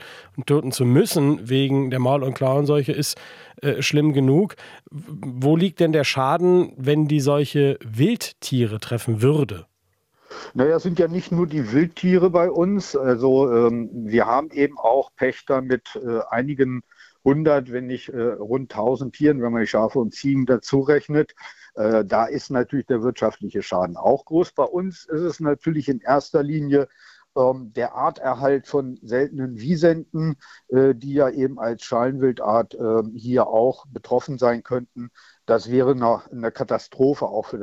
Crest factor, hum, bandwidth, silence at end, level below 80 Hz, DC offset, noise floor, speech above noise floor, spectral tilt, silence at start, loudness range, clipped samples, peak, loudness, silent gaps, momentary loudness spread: 18 dB; none; 16 kHz; 0 s; -58 dBFS; under 0.1%; -68 dBFS; 47 dB; -6.5 dB/octave; 0 s; 3 LU; under 0.1%; -4 dBFS; -21 LUFS; none; 9 LU